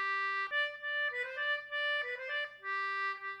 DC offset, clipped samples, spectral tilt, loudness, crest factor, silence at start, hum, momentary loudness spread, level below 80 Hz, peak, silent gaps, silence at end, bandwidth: under 0.1%; under 0.1%; -0.5 dB/octave; -35 LUFS; 12 dB; 0 s; none; 4 LU; -84 dBFS; -24 dBFS; none; 0 s; 11.5 kHz